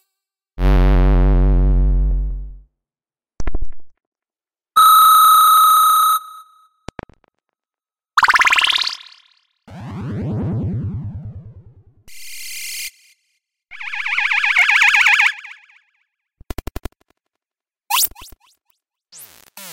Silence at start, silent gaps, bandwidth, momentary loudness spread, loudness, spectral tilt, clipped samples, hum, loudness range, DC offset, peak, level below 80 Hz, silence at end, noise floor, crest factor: 0.55 s; 4.07-4.12 s; 16.5 kHz; 24 LU; -14 LUFS; -3 dB/octave; under 0.1%; none; 15 LU; under 0.1%; -4 dBFS; -24 dBFS; 0 s; under -90 dBFS; 14 dB